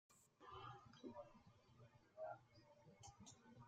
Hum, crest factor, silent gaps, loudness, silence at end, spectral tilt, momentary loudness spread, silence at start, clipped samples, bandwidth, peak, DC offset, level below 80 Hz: none; 20 dB; none; -60 LUFS; 0 s; -5 dB/octave; 9 LU; 0.1 s; under 0.1%; 12 kHz; -42 dBFS; under 0.1%; -84 dBFS